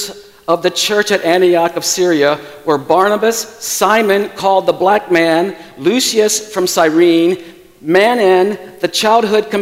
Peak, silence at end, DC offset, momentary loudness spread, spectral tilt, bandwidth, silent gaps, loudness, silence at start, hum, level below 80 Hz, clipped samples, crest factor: 0 dBFS; 0 s; under 0.1%; 8 LU; -3 dB/octave; 16.5 kHz; none; -13 LUFS; 0 s; none; -58 dBFS; under 0.1%; 12 dB